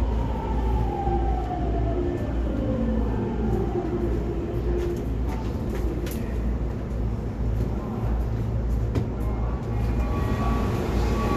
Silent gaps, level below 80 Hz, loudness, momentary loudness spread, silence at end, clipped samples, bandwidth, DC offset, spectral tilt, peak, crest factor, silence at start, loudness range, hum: none; -28 dBFS; -27 LUFS; 4 LU; 0 s; under 0.1%; 13.5 kHz; under 0.1%; -8.5 dB/octave; -12 dBFS; 12 dB; 0 s; 2 LU; none